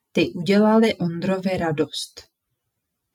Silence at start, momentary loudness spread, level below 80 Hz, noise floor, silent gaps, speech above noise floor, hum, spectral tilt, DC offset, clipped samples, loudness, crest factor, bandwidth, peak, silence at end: 0.15 s; 10 LU; -60 dBFS; -78 dBFS; none; 58 dB; none; -6 dB/octave; under 0.1%; under 0.1%; -21 LUFS; 16 dB; 13 kHz; -6 dBFS; 0.95 s